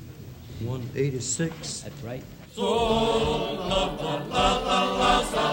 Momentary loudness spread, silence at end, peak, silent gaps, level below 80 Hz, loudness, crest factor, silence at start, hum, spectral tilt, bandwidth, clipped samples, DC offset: 16 LU; 0 s; -8 dBFS; none; -42 dBFS; -25 LUFS; 18 dB; 0 s; none; -4 dB/octave; 16.5 kHz; under 0.1%; under 0.1%